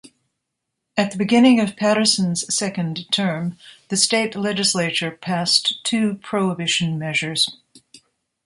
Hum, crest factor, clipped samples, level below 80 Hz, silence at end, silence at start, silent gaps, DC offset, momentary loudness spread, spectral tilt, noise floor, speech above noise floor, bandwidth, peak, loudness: none; 20 dB; under 0.1%; -64 dBFS; 0.7 s; 0.05 s; none; under 0.1%; 8 LU; -3.5 dB/octave; -79 dBFS; 59 dB; 11.5 kHz; -2 dBFS; -19 LUFS